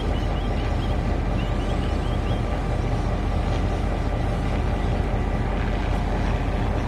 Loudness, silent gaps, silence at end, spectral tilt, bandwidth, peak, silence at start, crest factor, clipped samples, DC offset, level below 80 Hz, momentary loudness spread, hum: -25 LUFS; none; 0 s; -7.5 dB/octave; 9.8 kHz; -12 dBFS; 0 s; 12 dB; under 0.1%; under 0.1%; -26 dBFS; 1 LU; none